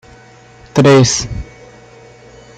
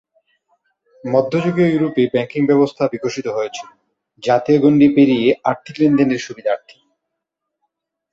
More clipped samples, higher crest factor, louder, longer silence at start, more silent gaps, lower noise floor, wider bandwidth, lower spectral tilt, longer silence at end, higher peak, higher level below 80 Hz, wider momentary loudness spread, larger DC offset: neither; about the same, 14 dB vs 16 dB; first, -11 LUFS vs -16 LUFS; second, 0.75 s vs 1.05 s; neither; second, -41 dBFS vs -79 dBFS; first, 9.4 kHz vs 7.6 kHz; second, -5 dB/octave vs -7 dB/octave; second, 1.15 s vs 1.55 s; about the same, -2 dBFS vs -2 dBFS; first, -36 dBFS vs -58 dBFS; first, 20 LU vs 12 LU; neither